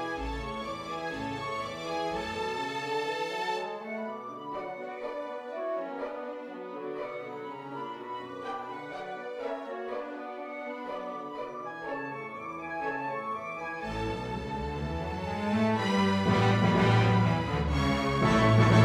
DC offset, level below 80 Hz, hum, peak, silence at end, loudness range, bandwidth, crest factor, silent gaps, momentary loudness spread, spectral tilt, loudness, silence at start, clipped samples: under 0.1%; -46 dBFS; none; -10 dBFS; 0 s; 12 LU; 11.5 kHz; 20 dB; none; 14 LU; -6.5 dB/octave; -31 LUFS; 0 s; under 0.1%